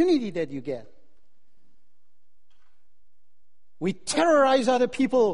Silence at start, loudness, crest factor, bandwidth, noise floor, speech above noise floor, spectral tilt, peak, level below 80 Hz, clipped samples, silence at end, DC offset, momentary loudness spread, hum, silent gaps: 0 s; -23 LUFS; 18 dB; 10.5 kHz; -80 dBFS; 57 dB; -4.5 dB/octave; -8 dBFS; -64 dBFS; under 0.1%; 0 s; 0.9%; 14 LU; none; none